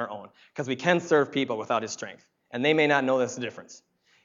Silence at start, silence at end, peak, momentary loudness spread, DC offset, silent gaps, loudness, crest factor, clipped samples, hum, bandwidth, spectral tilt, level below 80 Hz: 0 s; 0.5 s; -6 dBFS; 18 LU; under 0.1%; none; -26 LUFS; 22 dB; under 0.1%; none; 7.6 kHz; -4.5 dB/octave; -80 dBFS